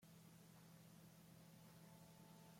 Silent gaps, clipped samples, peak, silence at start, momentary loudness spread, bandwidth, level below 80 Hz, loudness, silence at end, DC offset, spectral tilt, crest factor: none; under 0.1%; -52 dBFS; 0 s; 1 LU; 16.5 kHz; -88 dBFS; -65 LUFS; 0 s; under 0.1%; -5 dB/octave; 12 dB